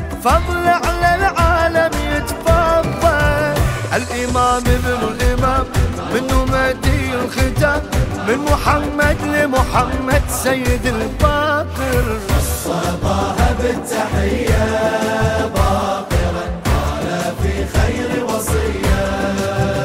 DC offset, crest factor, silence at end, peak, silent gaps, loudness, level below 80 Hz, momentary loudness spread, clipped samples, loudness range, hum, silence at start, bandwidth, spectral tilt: under 0.1%; 16 dB; 0 s; 0 dBFS; none; -17 LUFS; -22 dBFS; 5 LU; under 0.1%; 3 LU; none; 0 s; 16 kHz; -5.5 dB/octave